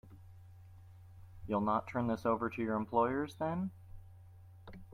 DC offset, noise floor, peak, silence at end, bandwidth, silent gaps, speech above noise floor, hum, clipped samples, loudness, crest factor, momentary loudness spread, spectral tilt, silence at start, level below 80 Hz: under 0.1%; -56 dBFS; -18 dBFS; 0 s; 15 kHz; none; 21 dB; none; under 0.1%; -35 LUFS; 20 dB; 25 LU; -8 dB/octave; 0.05 s; -62 dBFS